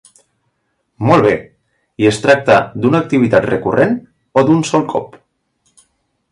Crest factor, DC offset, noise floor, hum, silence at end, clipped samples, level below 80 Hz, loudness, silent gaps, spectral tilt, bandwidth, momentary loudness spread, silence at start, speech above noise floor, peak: 14 dB; under 0.1%; -67 dBFS; none; 1.25 s; under 0.1%; -48 dBFS; -14 LUFS; none; -6.5 dB/octave; 11.5 kHz; 9 LU; 1 s; 54 dB; 0 dBFS